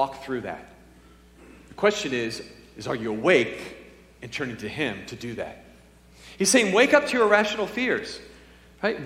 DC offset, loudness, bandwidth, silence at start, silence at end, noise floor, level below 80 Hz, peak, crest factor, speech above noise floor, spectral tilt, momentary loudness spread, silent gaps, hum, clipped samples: under 0.1%; -24 LUFS; 16 kHz; 0 s; 0 s; -52 dBFS; -56 dBFS; -2 dBFS; 24 dB; 28 dB; -3 dB/octave; 19 LU; none; none; under 0.1%